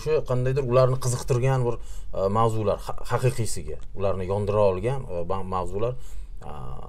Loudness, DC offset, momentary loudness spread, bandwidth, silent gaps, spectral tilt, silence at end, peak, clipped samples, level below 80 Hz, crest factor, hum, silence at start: -25 LUFS; under 0.1%; 16 LU; 14.5 kHz; none; -6.5 dB/octave; 0 s; -8 dBFS; under 0.1%; -38 dBFS; 16 dB; none; 0 s